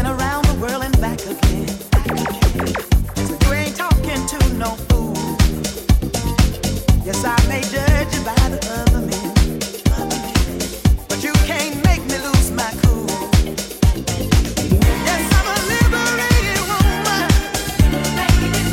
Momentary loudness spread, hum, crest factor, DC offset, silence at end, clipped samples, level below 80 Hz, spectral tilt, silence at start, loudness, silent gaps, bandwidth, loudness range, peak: 5 LU; none; 16 dB; under 0.1%; 0 s; under 0.1%; -20 dBFS; -5 dB/octave; 0 s; -18 LUFS; none; 17 kHz; 2 LU; -2 dBFS